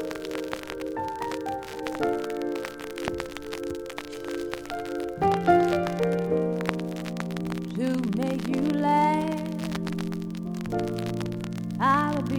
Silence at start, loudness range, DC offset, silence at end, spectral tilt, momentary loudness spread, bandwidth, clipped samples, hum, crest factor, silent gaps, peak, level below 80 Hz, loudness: 0 s; 6 LU; under 0.1%; 0 s; -6.5 dB/octave; 11 LU; 18 kHz; under 0.1%; none; 22 dB; none; -4 dBFS; -54 dBFS; -28 LUFS